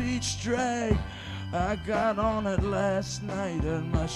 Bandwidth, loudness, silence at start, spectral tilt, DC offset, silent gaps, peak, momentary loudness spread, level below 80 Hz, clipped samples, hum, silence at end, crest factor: 13 kHz; -29 LUFS; 0 s; -5.5 dB/octave; under 0.1%; none; -10 dBFS; 6 LU; -38 dBFS; under 0.1%; none; 0 s; 18 dB